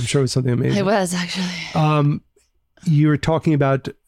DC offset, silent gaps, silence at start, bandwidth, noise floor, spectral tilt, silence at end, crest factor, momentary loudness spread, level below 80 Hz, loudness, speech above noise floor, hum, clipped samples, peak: under 0.1%; none; 0 s; 13.5 kHz; -60 dBFS; -6 dB/octave; 0.15 s; 12 dB; 6 LU; -48 dBFS; -19 LUFS; 42 dB; none; under 0.1%; -8 dBFS